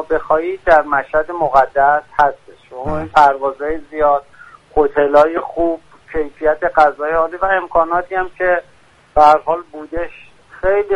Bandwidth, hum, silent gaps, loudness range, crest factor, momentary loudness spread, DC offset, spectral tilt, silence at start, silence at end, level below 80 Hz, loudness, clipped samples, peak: 10.5 kHz; none; none; 2 LU; 16 dB; 12 LU; under 0.1%; -6 dB/octave; 0 s; 0 s; -38 dBFS; -15 LUFS; under 0.1%; 0 dBFS